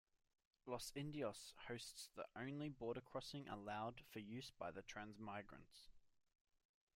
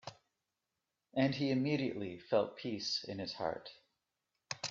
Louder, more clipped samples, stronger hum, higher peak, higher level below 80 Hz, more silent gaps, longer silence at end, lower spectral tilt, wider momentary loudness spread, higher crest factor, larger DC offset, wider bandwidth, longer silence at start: second, -52 LUFS vs -37 LUFS; neither; neither; second, -34 dBFS vs -18 dBFS; about the same, -76 dBFS vs -76 dBFS; neither; first, 0.85 s vs 0 s; about the same, -4.5 dB/octave vs -5 dB/octave; second, 7 LU vs 13 LU; about the same, 20 dB vs 22 dB; neither; first, 16 kHz vs 7.8 kHz; first, 0.65 s vs 0.05 s